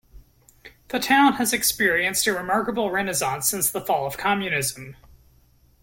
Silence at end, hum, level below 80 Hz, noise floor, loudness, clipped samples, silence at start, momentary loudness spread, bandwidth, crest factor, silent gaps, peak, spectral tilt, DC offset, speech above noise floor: 0.9 s; none; -54 dBFS; -58 dBFS; -22 LUFS; under 0.1%; 0.15 s; 9 LU; 17 kHz; 18 dB; none; -6 dBFS; -2.5 dB/octave; under 0.1%; 35 dB